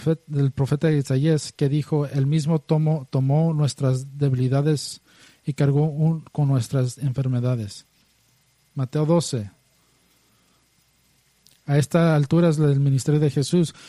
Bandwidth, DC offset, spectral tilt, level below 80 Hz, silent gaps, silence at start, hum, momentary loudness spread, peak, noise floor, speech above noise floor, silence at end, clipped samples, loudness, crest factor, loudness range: 12 kHz; under 0.1%; -7 dB/octave; -58 dBFS; none; 0 s; none; 10 LU; -6 dBFS; -63 dBFS; 42 dB; 0 s; under 0.1%; -22 LUFS; 16 dB; 7 LU